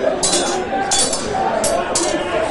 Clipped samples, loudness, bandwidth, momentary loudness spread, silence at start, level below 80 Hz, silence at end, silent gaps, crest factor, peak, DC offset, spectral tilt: under 0.1%; -17 LUFS; 12 kHz; 4 LU; 0 s; -42 dBFS; 0 s; none; 16 dB; -2 dBFS; under 0.1%; -2 dB/octave